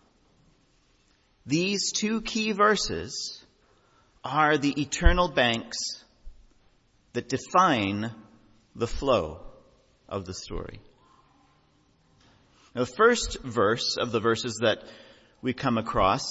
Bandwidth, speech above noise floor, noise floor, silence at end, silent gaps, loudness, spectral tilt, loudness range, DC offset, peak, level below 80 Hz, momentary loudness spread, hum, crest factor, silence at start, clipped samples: 8 kHz; 39 dB; -65 dBFS; 0 s; none; -26 LUFS; -4 dB/octave; 7 LU; under 0.1%; -4 dBFS; -38 dBFS; 15 LU; none; 24 dB; 1.45 s; under 0.1%